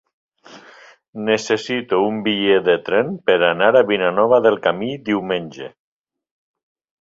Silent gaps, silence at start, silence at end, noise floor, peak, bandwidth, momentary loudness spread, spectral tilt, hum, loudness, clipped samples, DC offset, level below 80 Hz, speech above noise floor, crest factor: 1.08-1.13 s; 0.5 s; 1.3 s; -46 dBFS; -2 dBFS; 7.8 kHz; 11 LU; -5 dB/octave; none; -17 LUFS; under 0.1%; under 0.1%; -62 dBFS; 29 dB; 18 dB